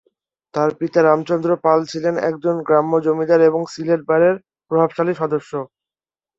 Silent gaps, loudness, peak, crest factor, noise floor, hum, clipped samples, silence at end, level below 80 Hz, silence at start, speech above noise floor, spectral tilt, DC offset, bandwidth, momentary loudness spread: none; -18 LUFS; -2 dBFS; 16 dB; under -90 dBFS; none; under 0.1%; 0.7 s; -64 dBFS; 0.55 s; over 73 dB; -7 dB/octave; under 0.1%; 7.8 kHz; 9 LU